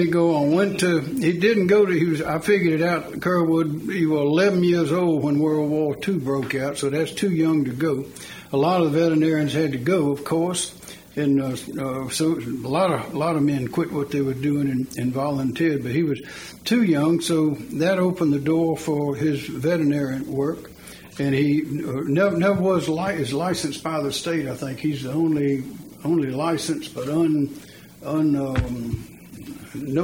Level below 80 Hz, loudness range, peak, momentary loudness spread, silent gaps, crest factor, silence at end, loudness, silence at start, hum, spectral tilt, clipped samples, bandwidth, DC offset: -50 dBFS; 4 LU; -6 dBFS; 9 LU; none; 14 dB; 0 s; -22 LUFS; 0 s; none; -6 dB/octave; under 0.1%; 17 kHz; under 0.1%